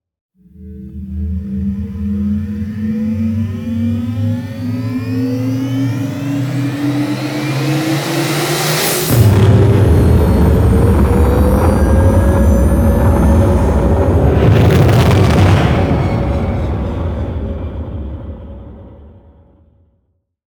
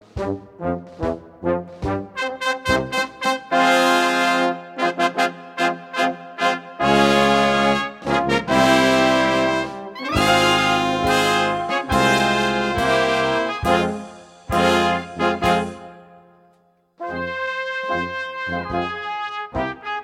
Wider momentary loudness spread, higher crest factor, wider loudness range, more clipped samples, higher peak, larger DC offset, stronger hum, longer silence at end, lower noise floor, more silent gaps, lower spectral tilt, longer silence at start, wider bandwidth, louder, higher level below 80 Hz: about the same, 12 LU vs 12 LU; second, 12 dB vs 18 dB; about the same, 10 LU vs 8 LU; neither; about the same, 0 dBFS vs -2 dBFS; neither; neither; first, 1.5 s vs 0 s; first, -63 dBFS vs -59 dBFS; neither; first, -6.5 dB/octave vs -4 dB/octave; first, 0.6 s vs 0.15 s; first, over 20 kHz vs 16 kHz; first, -13 LUFS vs -20 LUFS; first, -20 dBFS vs -42 dBFS